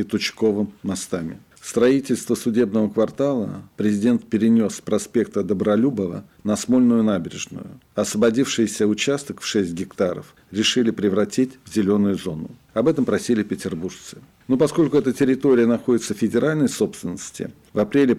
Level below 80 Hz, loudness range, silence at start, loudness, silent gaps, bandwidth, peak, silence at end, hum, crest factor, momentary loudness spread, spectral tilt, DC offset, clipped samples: -58 dBFS; 2 LU; 0 s; -21 LUFS; none; 14.5 kHz; -8 dBFS; 0 s; none; 12 dB; 13 LU; -5 dB/octave; under 0.1%; under 0.1%